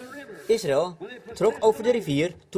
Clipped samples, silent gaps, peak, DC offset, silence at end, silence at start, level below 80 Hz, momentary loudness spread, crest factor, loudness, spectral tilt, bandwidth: under 0.1%; none; -8 dBFS; under 0.1%; 0 s; 0 s; -60 dBFS; 17 LU; 16 dB; -24 LUFS; -5.5 dB/octave; 16 kHz